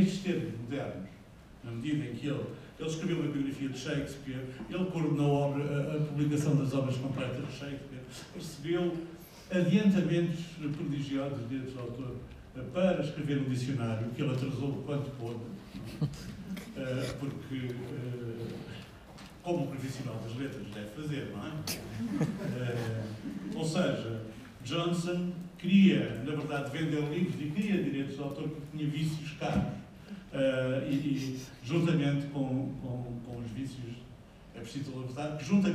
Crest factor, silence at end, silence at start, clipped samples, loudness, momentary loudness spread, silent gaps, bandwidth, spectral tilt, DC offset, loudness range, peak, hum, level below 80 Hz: 20 dB; 0 s; 0 s; under 0.1%; -34 LUFS; 14 LU; none; 15.5 kHz; -7 dB/octave; under 0.1%; 8 LU; -14 dBFS; none; -58 dBFS